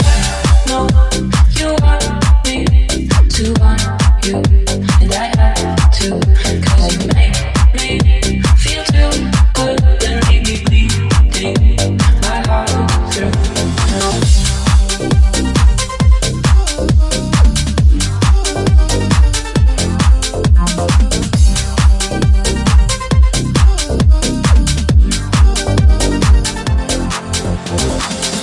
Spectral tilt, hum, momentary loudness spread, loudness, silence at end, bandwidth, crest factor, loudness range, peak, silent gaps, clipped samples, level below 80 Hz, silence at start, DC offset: -5 dB/octave; none; 2 LU; -13 LUFS; 0 s; 12 kHz; 10 dB; 1 LU; 0 dBFS; none; under 0.1%; -12 dBFS; 0 s; under 0.1%